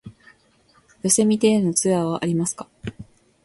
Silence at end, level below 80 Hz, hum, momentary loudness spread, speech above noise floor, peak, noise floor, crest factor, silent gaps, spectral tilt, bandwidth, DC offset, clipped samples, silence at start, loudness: 0.4 s; -56 dBFS; none; 18 LU; 38 dB; -4 dBFS; -59 dBFS; 18 dB; none; -4.5 dB/octave; 12 kHz; under 0.1%; under 0.1%; 0.05 s; -20 LUFS